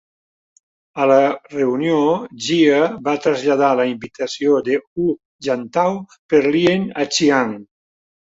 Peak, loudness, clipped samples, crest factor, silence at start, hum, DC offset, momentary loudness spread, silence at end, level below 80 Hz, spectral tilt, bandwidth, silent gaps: -2 dBFS; -18 LUFS; under 0.1%; 16 dB; 0.95 s; none; under 0.1%; 9 LU; 0.75 s; -60 dBFS; -5 dB/octave; 8 kHz; 4.87-4.96 s, 5.25-5.39 s, 6.19-6.29 s